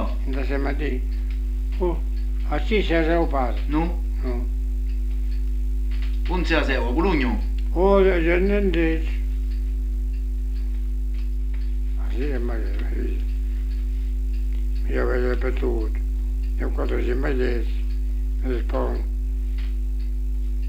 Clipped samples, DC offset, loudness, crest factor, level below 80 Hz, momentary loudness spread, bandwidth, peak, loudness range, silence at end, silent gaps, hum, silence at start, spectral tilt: under 0.1%; under 0.1%; -25 LUFS; 18 dB; -22 dBFS; 7 LU; 5.6 kHz; -4 dBFS; 6 LU; 0 s; none; 50 Hz at -25 dBFS; 0 s; -8 dB/octave